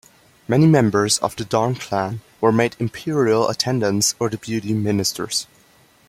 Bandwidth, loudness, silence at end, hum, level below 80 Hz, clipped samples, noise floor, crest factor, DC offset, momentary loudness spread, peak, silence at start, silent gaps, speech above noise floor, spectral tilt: 16 kHz; -19 LUFS; 0.65 s; none; -56 dBFS; under 0.1%; -54 dBFS; 18 dB; under 0.1%; 9 LU; -2 dBFS; 0.5 s; none; 35 dB; -4.5 dB/octave